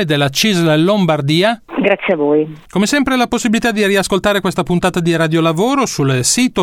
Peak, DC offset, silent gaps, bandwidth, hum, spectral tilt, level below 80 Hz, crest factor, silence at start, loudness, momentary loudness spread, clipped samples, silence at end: 0 dBFS; under 0.1%; none; 16.5 kHz; none; -4.5 dB/octave; -42 dBFS; 12 dB; 0 s; -14 LUFS; 4 LU; under 0.1%; 0 s